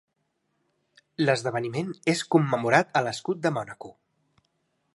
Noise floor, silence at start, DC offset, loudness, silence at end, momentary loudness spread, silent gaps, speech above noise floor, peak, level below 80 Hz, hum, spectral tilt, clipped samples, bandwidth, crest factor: -76 dBFS; 1.2 s; under 0.1%; -25 LUFS; 1.05 s; 17 LU; none; 51 dB; -4 dBFS; -72 dBFS; none; -5.5 dB/octave; under 0.1%; 11.5 kHz; 24 dB